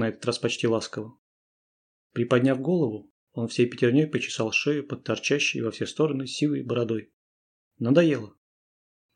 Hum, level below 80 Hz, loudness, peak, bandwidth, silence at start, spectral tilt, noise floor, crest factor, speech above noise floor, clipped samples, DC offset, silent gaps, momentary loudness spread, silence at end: none; -74 dBFS; -26 LUFS; -6 dBFS; 10 kHz; 0 s; -5.5 dB/octave; under -90 dBFS; 20 dB; over 65 dB; under 0.1%; under 0.1%; 1.18-2.10 s, 3.10-3.27 s, 7.13-7.71 s; 12 LU; 0.85 s